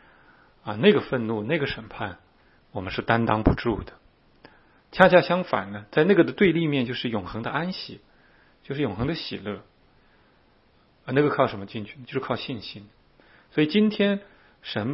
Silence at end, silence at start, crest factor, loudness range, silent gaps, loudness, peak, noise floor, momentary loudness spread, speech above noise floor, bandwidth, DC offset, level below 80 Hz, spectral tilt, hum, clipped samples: 0 s; 0.65 s; 26 dB; 9 LU; none; -24 LUFS; 0 dBFS; -60 dBFS; 17 LU; 37 dB; 5.8 kHz; under 0.1%; -46 dBFS; -8.5 dB/octave; none; under 0.1%